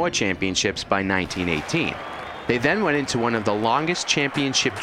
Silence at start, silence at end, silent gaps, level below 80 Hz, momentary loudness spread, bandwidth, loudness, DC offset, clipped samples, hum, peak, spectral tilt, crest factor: 0 s; 0 s; none; -50 dBFS; 4 LU; 15 kHz; -22 LUFS; under 0.1%; under 0.1%; none; -4 dBFS; -3.5 dB/octave; 18 dB